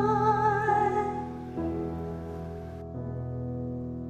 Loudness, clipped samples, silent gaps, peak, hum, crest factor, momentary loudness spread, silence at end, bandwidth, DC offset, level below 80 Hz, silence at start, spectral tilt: -30 LUFS; under 0.1%; none; -14 dBFS; none; 16 dB; 14 LU; 0 s; 9 kHz; under 0.1%; -48 dBFS; 0 s; -8 dB/octave